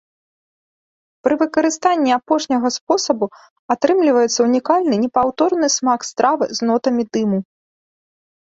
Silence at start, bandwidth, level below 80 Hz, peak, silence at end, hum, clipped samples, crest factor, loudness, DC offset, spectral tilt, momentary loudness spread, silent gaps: 1.25 s; 8 kHz; -62 dBFS; -2 dBFS; 1.05 s; none; under 0.1%; 16 dB; -17 LUFS; under 0.1%; -4 dB/octave; 5 LU; 2.81-2.87 s, 3.50-3.69 s